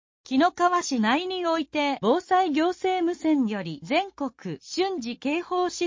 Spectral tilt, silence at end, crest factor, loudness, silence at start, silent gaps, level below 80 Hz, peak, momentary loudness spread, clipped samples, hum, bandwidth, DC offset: -4.5 dB/octave; 0 s; 16 dB; -25 LUFS; 0.3 s; none; -66 dBFS; -10 dBFS; 9 LU; under 0.1%; none; 7.6 kHz; under 0.1%